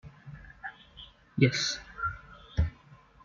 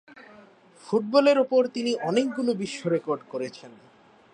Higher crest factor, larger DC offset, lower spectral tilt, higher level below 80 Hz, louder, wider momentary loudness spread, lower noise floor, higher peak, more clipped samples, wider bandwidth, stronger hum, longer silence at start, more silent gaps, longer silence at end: first, 24 dB vs 18 dB; neither; about the same, -4.5 dB/octave vs -5.5 dB/octave; first, -44 dBFS vs -76 dBFS; second, -31 LUFS vs -25 LUFS; first, 23 LU vs 14 LU; about the same, -56 dBFS vs -53 dBFS; about the same, -10 dBFS vs -8 dBFS; neither; second, 7.4 kHz vs 10 kHz; neither; about the same, 0.05 s vs 0.15 s; neither; second, 0.3 s vs 0.65 s